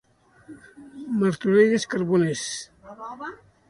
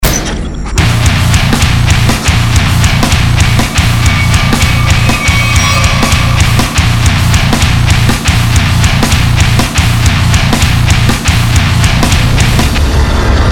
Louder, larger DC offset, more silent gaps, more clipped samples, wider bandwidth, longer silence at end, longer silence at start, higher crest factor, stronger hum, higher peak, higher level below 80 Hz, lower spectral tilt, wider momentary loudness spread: second, -22 LUFS vs -9 LUFS; second, under 0.1% vs 0.7%; neither; second, under 0.1% vs 0.3%; second, 11.5 kHz vs 19.5 kHz; first, 0.35 s vs 0 s; first, 0.5 s vs 0 s; first, 18 dB vs 8 dB; neither; second, -6 dBFS vs 0 dBFS; second, -64 dBFS vs -14 dBFS; about the same, -5.5 dB/octave vs -4.5 dB/octave; first, 22 LU vs 1 LU